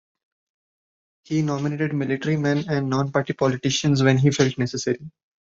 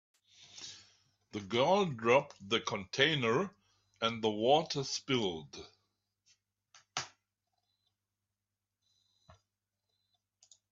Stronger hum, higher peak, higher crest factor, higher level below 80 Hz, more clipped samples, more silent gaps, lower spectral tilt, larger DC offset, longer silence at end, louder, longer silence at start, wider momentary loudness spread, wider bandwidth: second, none vs 50 Hz at -65 dBFS; first, -4 dBFS vs -12 dBFS; second, 18 dB vs 24 dB; first, -58 dBFS vs -76 dBFS; neither; neither; first, -5.5 dB/octave vs -4 dB/octave; neither; second, 0.3 s vs 3.65 s; first, -22 LUFS vs -32 LUFS; first, 1.3 s vs 0.4 s; second, 7 LU vs 19 LU; about the same, 7.8 kHz vs 7.8 kHz